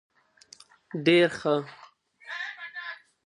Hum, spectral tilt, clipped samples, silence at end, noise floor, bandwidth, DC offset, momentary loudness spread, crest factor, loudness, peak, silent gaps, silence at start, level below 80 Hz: none; -5.5 dB/octave; under 0.1%; 0.3 s; -56 dBFS; 10.5 kHz; under 0.1%; 18 LU; 20 dB; -26 LUFS; -8 dBFS; none; 0.95 s; -74 dBFS